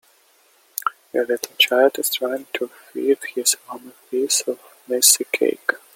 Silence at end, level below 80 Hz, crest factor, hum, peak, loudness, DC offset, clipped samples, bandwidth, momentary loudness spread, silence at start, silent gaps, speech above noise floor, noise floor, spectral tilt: 0.2 s; -78 dBFS; 22 dB; none; 0 dBFS; -20 LUFS; under 0.1%; under 0.1%; 17 kHz; 15 LU; 0.85 s; none; 36 dB; -57 dBFS; 0.5 dB/octave